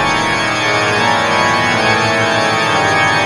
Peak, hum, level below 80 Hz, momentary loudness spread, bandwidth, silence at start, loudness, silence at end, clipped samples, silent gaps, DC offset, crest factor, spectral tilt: 0 dBFS; none; -42 dBFS; 2 LU; 15 kHz; 0 s; -12 LUFS; 0 s; under 0.1%; none; under 0.1%; 12 dB; -3.5 dB/octave